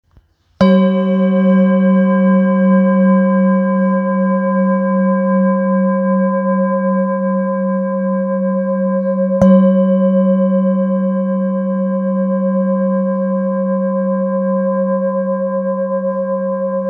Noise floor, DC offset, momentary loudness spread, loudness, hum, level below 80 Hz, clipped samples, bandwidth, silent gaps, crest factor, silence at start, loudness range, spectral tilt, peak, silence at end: -52 dBFS; under 0.1%; 6 LU; -14 LUFS; none; -52 dBFS; under 0.1%; 5 kHz; none; 14 dB; 0.6 s; 4 LU; -10.5 dB/octave; 0 dBFS; 0 s